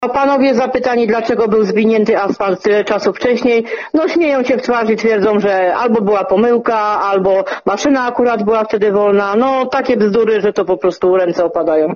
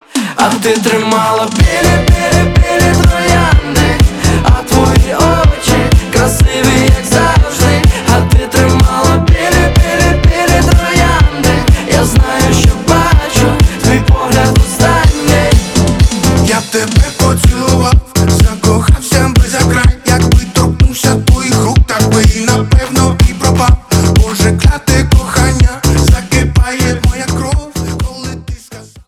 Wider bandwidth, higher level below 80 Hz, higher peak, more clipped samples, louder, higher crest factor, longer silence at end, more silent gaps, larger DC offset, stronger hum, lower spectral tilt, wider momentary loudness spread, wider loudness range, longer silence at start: second, 7.2 kHz vs 16.5 kHz; second, -50 dBFS vs -14 dBFS; about the same, -2 dBFS vs 0 dBFS; second, under 0.1% vs 4%; second, -13 LUFS vs -10 LUFS; about the same, 10 dB vs 8 dB; about the same, 0 s vs 0.05 s; neither; second, under 0.1% vs 0.2%; neither; about the same, -4.5 dB/octave vs -5 dB/octave; about the same, 3 LU vs 3 LU; about the same, 1 LU vs 1 LU; second, 0 s vs 0.15 s